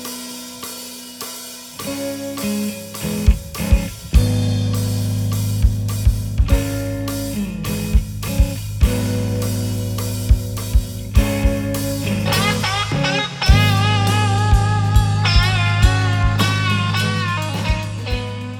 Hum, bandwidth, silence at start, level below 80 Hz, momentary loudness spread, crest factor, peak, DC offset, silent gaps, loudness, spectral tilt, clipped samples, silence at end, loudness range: none; 19.5 kHz; 0 s; -22 dBFS; 10 LU; 18 dB; 0 dBFS; under 0.1%; none; -19 LUFS; -5 dB/octave; under 0.1%; 0 s; 5 LU